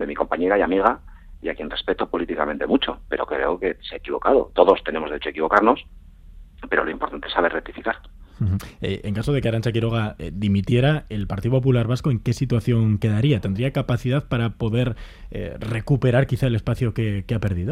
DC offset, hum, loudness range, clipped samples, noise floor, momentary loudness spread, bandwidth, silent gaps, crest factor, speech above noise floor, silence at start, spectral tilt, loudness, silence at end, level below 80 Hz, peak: under 0.1%; none; 4 LU; under 0.1%; -43 dBFS; 10 LU; 13 kHz; none; 22 dB; 22 dB; 0 s; -7.5 dB/octave; -22 LUFS; 0 s; -40 dBFS; 0 dBFS